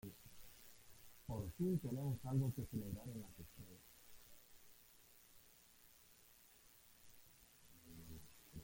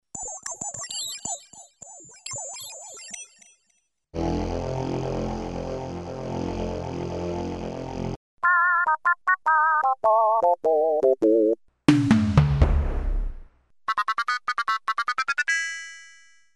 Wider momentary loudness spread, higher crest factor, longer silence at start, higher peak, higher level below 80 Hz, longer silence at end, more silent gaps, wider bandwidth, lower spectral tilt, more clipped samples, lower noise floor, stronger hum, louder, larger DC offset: first, 23 LU vs 17 LU; about the same, 20 dB vs 20 dB; about the same, 0.05 s vs 0.15 s; second, -30 dBFS vs -6 dBFS; second, -68 dBFS vs -34 dBFS; second, 0 s vs 0.45 s; second, none vs 8.16-8.37 s; first, 17 kHz vs 11.5 kHz; first, -7 dB/octave vs -5 dB/octave; neither; about the same, -68 dBFS vs -71 dBFS; neither; second, -46 LUFS vs -24 LUFS; neither